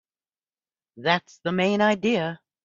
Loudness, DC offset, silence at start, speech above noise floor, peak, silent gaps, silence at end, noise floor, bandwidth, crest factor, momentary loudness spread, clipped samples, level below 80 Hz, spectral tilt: -24 LUFS; under 0.1%; 0.95 s; over 67 dB; -4 dBFS; none; 0.3 s; under -90 dBFS; 7.6 kHz; 22 dB; 8 LU; under 0.1%; -68 dBFS; -5.5 dB/octave